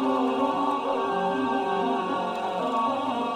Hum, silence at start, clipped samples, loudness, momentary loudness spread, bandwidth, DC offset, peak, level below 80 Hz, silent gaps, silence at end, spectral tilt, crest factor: none; 0 s; under 0.1%; -26 LUFS; 3 LU; 11 kHz; under 0.1%; -14 dBFS; -66 dBFS; none; 0 s; -5.5 dB/octave; 12 dB